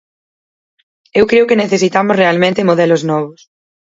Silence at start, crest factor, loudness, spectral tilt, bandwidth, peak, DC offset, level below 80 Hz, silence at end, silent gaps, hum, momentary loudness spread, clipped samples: 1.15 s; 14 dB; -12 LUFS; -5.5 dB/octave; 7.8 kHz; 0 dBFS; under 0.1%; -52 dBFS; 0.6 s; none; none; 7 LU; under 0.1%